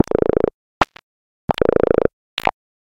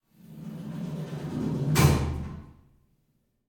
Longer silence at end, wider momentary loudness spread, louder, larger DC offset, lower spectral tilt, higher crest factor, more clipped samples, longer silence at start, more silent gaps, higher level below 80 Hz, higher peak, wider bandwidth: second, 0.45 s vs 0.95 s; second, 8 LU vs 19 LU; first, -19 LUFS vs -28 LUFS; neither; about the same, -6.5 dB/octave vs -6 dB/octave; about the same, 20 dB vs 24 dB; neither; first, 0.8 s vs 0.25 s; first, 1.03-1.48 s, 2.13-2.37 s vs none; about the same, -38 dBFS vs -42 dBFS; first, 0 dBFS vs -6 dBFS; second, 17 kHz vs 19.5 kHz